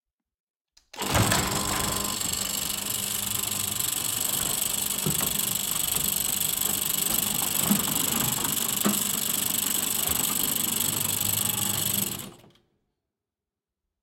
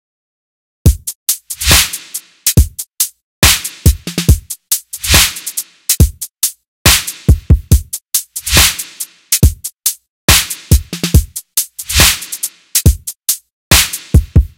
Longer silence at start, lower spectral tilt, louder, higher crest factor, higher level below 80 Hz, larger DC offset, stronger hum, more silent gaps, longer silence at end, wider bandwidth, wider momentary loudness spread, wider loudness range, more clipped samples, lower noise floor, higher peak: about the same, 0.95 s vs 0.85 s; about the same, -1.5 dB/octave vs -2.5 dB/octave; second, -24 LUFS vs -12 LUFS; first, 20 dB vs 14 dB; second, -50 dBFS vs -18 dBFS; neither; neither; second, none vs 1.15-1.26 s, 3.23-3.42 s, 6.68-6.85 s, 10.09-10.28 s, 13.53-13.71 s; first, 1.65 s vs 0.1 s; second, 17 kHz vs over 20 kHz; second, 4 LU vs 9 LU; about the same, 3 LU vs 1 LU; second, under 0.1% vs 1%; first, -89 dBFS vs -29 dBFS; second, -8 dBFS vs 0 dBFS